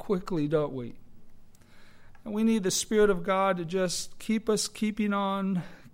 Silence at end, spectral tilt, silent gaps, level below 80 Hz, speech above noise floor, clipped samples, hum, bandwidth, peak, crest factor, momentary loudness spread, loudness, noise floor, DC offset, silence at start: 0.05 s; -4.5 dB/octave; none; -52 dBFS; 22 dB; under 0.1%; none; 16 kHz; -12 dBFS; 16 dB; 10 LU; -28 LUFS; -49 dBFS; under 0.1%; 0 s